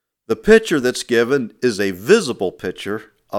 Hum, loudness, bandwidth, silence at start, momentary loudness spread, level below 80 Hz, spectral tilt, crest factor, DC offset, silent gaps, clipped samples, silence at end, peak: none; -18 LUFS; 16 kHz; 0.3 s; 14 LU; -44 dBFS; -4.5 dB/octave; 18 dB; under 0.1%; none; under 0.1%; 0 s; 0 dBFS